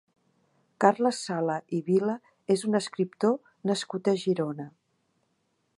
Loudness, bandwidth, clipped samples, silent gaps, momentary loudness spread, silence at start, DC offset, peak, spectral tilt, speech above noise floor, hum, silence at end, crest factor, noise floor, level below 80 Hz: -28 LUFS; 11.5 kHz; under 0.1%; none; 8 LU; 0.8 s; under 0.1%; -6 dBFS; -5.5 dB/octave; 48 dB; none; 1.1 s; 24 dB; -74 dBFS; -80 dBFS